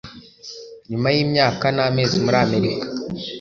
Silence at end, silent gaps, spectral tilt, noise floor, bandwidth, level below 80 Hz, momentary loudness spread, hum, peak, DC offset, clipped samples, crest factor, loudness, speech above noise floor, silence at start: 0 s; none; -5.5 dB/octave; -40 dBFS; 7.2 kHz; -52 dBFS; 19 LU; none; -2 dBFS; under 0.1%; under 0.1%; 18 dB; -19 LUFS; 20 dB; 0.05 s